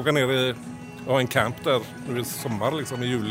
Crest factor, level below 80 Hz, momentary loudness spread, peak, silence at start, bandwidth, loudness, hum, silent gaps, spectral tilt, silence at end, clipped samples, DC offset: 22 dB; -60 dBFS; 10 LU; -4 dBFS; 0 s; 16 kHz; -25 LUFS; none; none; -5 dB/octave; 0 s; under 0.1%; under 0.1%